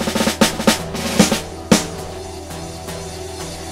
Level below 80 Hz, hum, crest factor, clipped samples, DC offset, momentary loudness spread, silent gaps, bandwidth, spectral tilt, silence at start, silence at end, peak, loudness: -38 dBFS; none; 20 dB; under 0.1%; under 0.1%; 14 LU; none; 16.5 kHz; -3.5 dB/octave; 0 s; 0 s; 0 dBFS; -19 LUFS